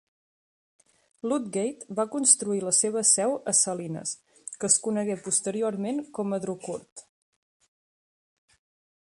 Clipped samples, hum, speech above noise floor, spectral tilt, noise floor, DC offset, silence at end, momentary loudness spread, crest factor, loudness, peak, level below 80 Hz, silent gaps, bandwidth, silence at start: under 0.1%; none; over 63 dB; -3 dB/octave; under -90 dBFS; under 0.1%; 2.15 s; 14 LU; 26 dB; -25 LUFS; -4 dBFS; -74 dBFS; 6.92-6.96 s; 11.5 kHz; 1.25 s